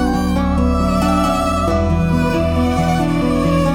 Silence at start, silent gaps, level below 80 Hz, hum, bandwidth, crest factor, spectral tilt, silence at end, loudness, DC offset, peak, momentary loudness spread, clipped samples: 0 s; none; -26 dBFS; none; 16.5 kHz; 12 dB; -7 dB/octave; 0 s; -16 LUFS; under 0.1%; -4 dBFS; 1 LU; under 0.1%